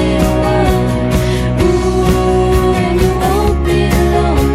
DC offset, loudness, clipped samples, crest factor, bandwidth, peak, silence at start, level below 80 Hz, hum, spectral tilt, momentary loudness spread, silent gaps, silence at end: under 0.1%; -13 LUFS; under 0.1%; 10 dB; 15.5 kHz; 0 dBFS; 0 s; -18 dBFS; none; -6.5 dB/octave; 2 LU; none; 0 s